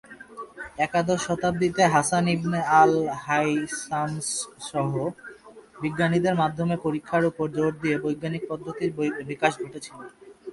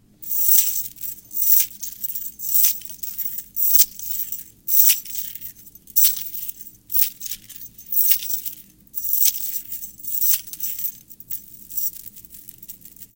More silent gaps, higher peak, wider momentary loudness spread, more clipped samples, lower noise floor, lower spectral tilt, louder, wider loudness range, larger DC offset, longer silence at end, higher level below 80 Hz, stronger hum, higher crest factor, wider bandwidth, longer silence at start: neither; second, -4 dBFS vs 0 dBFS; second, 18 LU vs 21 LU; neither; first, -48 dBFS vs -42 dBFS; first, -5 dB/octave vs 2 dB/octave; second, -25 LUFS vs -18 LUFS; about the same, 5 LU vs 4 LU; neither; about the same, 0 s vs 0.1 s; about the same, -58 dBFS vs -60 dBFS; neither; about the same, 20 dB vs 22 dB; second, 11.5 kHz vs 17.5 kHz; about the same, 0.1 s vs 0.2 s